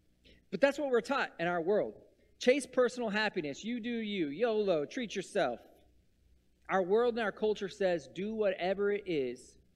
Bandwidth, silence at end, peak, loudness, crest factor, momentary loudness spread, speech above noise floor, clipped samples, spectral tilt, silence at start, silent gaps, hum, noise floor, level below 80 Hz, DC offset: 12 kHz; 0.3 s; -12 dBFS; -33 LUFS; 20 dB; 9 LU; 35 dB; under 0.1%; -5 dB/octave; 0.5 s; none; none; -68 dBFS; -68 dBFS; under 0.1%